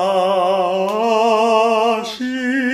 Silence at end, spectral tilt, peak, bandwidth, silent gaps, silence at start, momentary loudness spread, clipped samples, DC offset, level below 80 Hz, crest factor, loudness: 0 s; -4.5 dB/octave; -2 dBFS; 15 kHz; none; 0 s; 7 LU; under 0.1%; under 0.1%; -64 dBFS; 14 dB; -16 LUFS